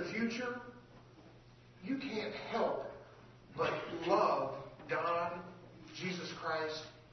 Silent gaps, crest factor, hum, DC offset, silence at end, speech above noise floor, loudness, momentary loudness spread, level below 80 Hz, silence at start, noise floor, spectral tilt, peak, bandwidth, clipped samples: none; 22 dB; none; under 0.1%; 0 s; 23 dB; -38 LUFS; 20 LU; -70 dBFS; 0 s; -60 dBFS; -3.5 dB/octave; -18 dBFS; 6.2 kHz; under 0.1%